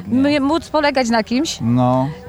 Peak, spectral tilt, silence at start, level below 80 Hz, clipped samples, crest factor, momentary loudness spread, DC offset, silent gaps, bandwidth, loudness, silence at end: -4 dBFS; -5.5 dB/octave; 0 s; -44 dBFS; under 0.1%; 12 dB; 3 LU; under 0.1%; none; 13.5 kHz; -17 LUFS; 0 s